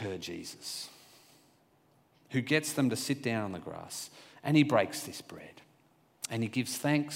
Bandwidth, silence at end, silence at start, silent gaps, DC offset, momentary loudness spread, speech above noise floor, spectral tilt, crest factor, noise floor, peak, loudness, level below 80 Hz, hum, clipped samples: 16 kHz; 0 s; 0 s; none; under 0.1%; 17 LU; 35 dB; -4.5 dB/octave; 22 dB; -67 dBFS; -12 dBFS; -32 LUFS; -76 dBFS; none; under 0.1%